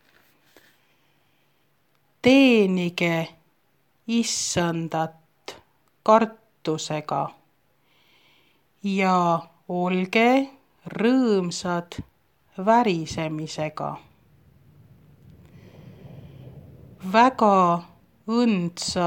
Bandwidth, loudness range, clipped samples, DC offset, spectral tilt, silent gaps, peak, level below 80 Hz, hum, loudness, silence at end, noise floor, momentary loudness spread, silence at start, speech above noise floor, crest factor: 16.5 kHz; 5 LU; under 0.1%; under 0.1%; -5 dB/octave; none; -4 dBFS; -60 dBFS; none; -22 LUFS; 0 s; -68 dBFS; 22 LU; 2.25 s; 46 dB; 20 dB